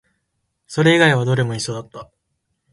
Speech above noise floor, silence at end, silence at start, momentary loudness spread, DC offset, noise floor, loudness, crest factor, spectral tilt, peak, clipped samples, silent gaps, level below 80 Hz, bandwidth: 56 dB; 0.7 s; 0.7 s; 17 LU; under 0.1%; -73 dBFS; -17 LUFS; 18 dB; -5.5 dB/octave; -2 dBFS; under 0.1%; none; -56 dBFS; 11.5 kHz